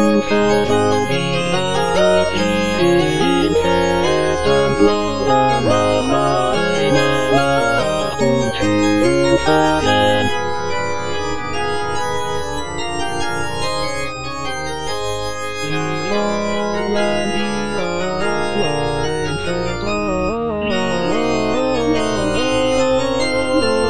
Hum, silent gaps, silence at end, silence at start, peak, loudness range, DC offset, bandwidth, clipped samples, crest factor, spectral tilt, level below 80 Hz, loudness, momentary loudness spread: none; none; 0 s; 0 s; -2 dBFS; 6 LU; 4%; 10.5 kHz; under 0.1%; 16 dB; -5 dB/octave; -38 dBFS; -17 LUFS; 8 LU